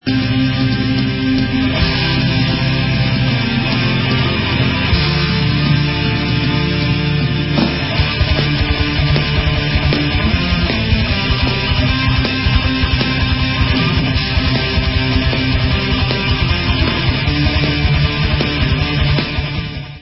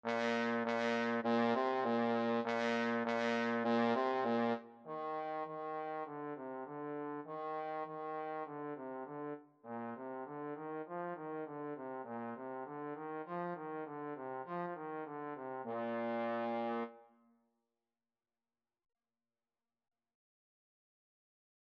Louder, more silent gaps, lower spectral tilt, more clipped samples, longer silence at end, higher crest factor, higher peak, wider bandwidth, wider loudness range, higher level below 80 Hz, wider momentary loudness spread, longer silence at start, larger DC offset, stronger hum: first, -15 LUFS vs -39 LUFS; neither; first, -9.5 dB/octave vs -6 dB/octave; neither; second, 0 s vs 4.65 s; second, 14 dB vs 20 dB; first, 0 dBFS vs -20 dBFS; second, 5.8 kHz vs 8 kHz; second, 0 LU vs 10 LU; first, -22 dBFS vs under -90 dBFS; second, 1 LU vs 11 LU; about the same, 0.05 s vs 0.05 s; neither; neither